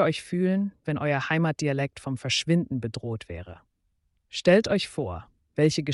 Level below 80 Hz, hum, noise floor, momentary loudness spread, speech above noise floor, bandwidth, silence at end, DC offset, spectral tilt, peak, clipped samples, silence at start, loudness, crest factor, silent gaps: -56 dBFS; none; -73 dBFS; 15 LU; 47 dB; 11.5 kHz; 0 s; under 0.1%; -5.5 dB/octave; -10 dBFS; under 0.1%; 0 s; -26 LUFS; 16 dB; none